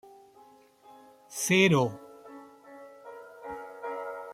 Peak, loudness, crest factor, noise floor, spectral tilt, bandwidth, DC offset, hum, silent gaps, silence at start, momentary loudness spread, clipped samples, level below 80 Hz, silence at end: -10 dBFS; -27 LUFS; 22 dB; -57 dBFS; -4.5 dB/octave; 16 kHz; under 0.1%; none; none; 0.05 s; 27 LU; under 0.1%; -72 dBFS; 0 s